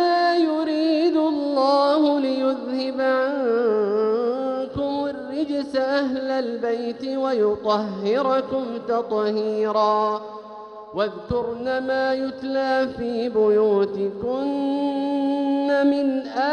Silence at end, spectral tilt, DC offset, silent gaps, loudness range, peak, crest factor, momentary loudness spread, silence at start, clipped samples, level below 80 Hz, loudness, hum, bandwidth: 0 s; -6.5 dB/octave; under 0.1%; none; 4 LU; -8 dBFS; 14 dB; 8 LU; 0 s; under 0.1%; -56 dBFS; -22 LUFS; none; 9.2 kHz